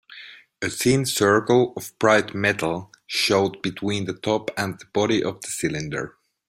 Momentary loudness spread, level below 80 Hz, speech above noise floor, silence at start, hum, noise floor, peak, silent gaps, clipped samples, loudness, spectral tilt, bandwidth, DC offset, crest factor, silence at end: 11 LU; -56 dBFS; 22 dB; 0.1 s; none; -44 dBFS; -2 dBFS; none; under 0.1%; -22 LUFS; -4 dB/octave; 16 kHz; under 0.1%; 20 dB; 0.4 s